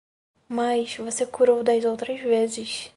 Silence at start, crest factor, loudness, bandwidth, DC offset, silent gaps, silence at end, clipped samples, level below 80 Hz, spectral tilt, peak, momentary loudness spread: 0.5 s; 16 dB; -24 LUFS; 11.5 kHz; under 0.1%; none; 0.1 s; under 0.1%; -68 dBFS; -3 dB/octave; -8 dBFS; 9 LU